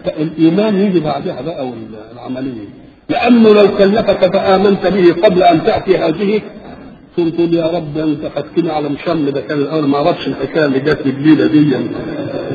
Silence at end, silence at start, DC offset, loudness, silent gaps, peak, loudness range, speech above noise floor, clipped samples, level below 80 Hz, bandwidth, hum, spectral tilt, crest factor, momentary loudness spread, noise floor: 0 s; 0 s; under 0.1%; -13 LUFS; none; 0 dBFS; 6 LU; 21 dB; under 0.1%; -44 dBFS; 6.8 kHz; none; -9 dB/octave; 12 dB; 14 LU; -34 dBFS